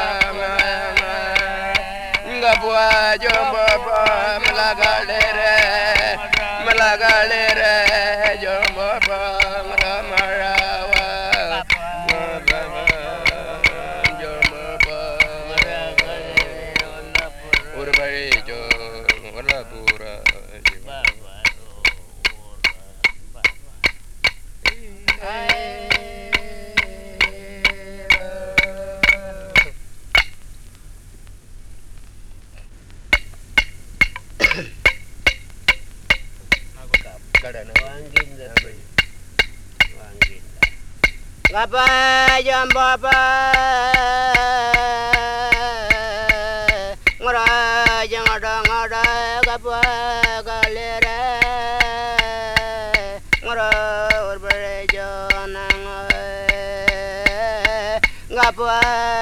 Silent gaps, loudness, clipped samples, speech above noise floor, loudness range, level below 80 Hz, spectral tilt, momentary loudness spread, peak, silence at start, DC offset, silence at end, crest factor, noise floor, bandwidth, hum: none; -17 LUFS; under 0.1%; 23 dB; 6 LU; -34 dBFS; -2.5 dB/octave; 7 LU; -2 dBFS; 0 s; under 0.1%; 0 s; 18 dB; -39 dBFS; over 20 kHz; none